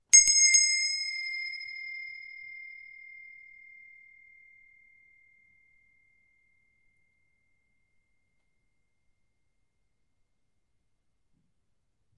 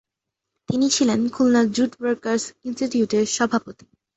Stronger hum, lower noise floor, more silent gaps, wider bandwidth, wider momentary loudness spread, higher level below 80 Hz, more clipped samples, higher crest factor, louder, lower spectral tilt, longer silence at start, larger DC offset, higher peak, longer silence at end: neither; second, -79 dBFS vs -83 dBFS; neither; first, 11.5 kHz vs 8.2 kHz; first, 29 LU vs 8 LU; second, -74 dBFS vs -60 dBFS; neither; first, 28 dB vs 16 dB; about the same, -23 LUFS vs -21 LUFS; second, 6 dB/octave vs -4 dB/octave; second, 0.15 s vs 0.7 s; neither; about the same, -6 dBFS vs -6 dBFS; first, 9.45 s vs 0.45 s